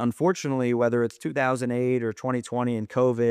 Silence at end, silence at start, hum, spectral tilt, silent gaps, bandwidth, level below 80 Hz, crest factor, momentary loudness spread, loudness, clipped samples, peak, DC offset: 0 s; 0 s; none; -6.5 dB/octave; none; 14 kHz; -70 dBFS; 14 dB; 5 LU; -25 LUFS; under 0.1%; -10 dBFS; under 0.1%